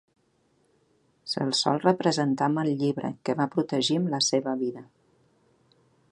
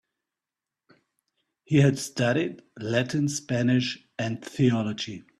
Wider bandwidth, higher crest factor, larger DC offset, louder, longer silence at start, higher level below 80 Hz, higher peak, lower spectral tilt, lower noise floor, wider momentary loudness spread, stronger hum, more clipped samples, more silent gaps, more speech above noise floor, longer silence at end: second, 11 kHz vs 13 kHz; about the same, 22 dB vs 20 dB; neither; about the same, -26 LUFS vs -26 LUFS; second, 1.25 s vs 1.7 s; second, -74 dBFS vs -62 dBFS; about the same, -6 dBFS vs -8 dBFS; about the same, -4.5 dB/octave vs -5.5 dB/octave; second, -68 dBFS vs -89 dBFS; about the same, 8 LU vs 10 LU; neither; neither; neither; second, 42 dB vs 64 dB; first, 1.3 s vs 0.2 s